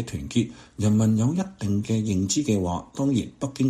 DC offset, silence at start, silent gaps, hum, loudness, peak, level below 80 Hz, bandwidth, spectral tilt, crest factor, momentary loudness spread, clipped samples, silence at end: under 0.1%; 0 s; none; none; -25 LUFS; -10 dBFS; -50 dBFS; 13.5 kHz; -6 dB/octave; 14 dB; 7 LU; under 0.1%; 0 s